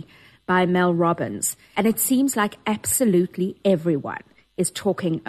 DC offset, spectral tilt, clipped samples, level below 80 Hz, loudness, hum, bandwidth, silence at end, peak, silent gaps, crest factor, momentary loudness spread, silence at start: under 0.1%; -4.5 dB/octave; under 0.1%; -62 dBFS; -22 LUFS; none; 13 kHz; 0 s; -6 dBFS; none; 16 dB; 8 LU; 0.5 s